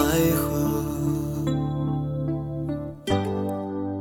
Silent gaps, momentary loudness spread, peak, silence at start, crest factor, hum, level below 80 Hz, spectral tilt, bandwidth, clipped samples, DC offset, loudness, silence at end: none; 8 LU; -10 dBFS; 0 s; 16 dB; none; -42 dBFS; -6.5 dB/octave; 17.5 kHz; under 0.1%; under 0.1%; -26 LUFS; 0 s